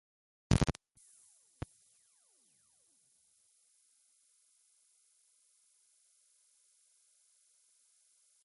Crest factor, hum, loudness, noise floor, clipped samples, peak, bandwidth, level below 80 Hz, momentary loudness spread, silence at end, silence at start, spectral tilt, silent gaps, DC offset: 32 dB; none; -36 LUFS; -72 dBFS; under 0.1%; -12 dBFS; 11.5 kHz; -52 dBFS; 30 LU; 7.75 s; 0.5 s; -6 dB/octave; none; under 0.1%